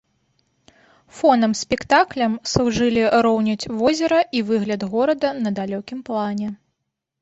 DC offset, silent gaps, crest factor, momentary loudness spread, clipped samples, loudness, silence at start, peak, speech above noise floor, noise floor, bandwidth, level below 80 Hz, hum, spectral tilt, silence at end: under 0.1%; none; 18 dB; 9 LU; under 0.1%; -20 LUFS; 1.15 s; -2 dBFS; 59 dB; -78 dBFS; 8 kHz; -50 dBFS; none; -5 dB/octave; 0.65 s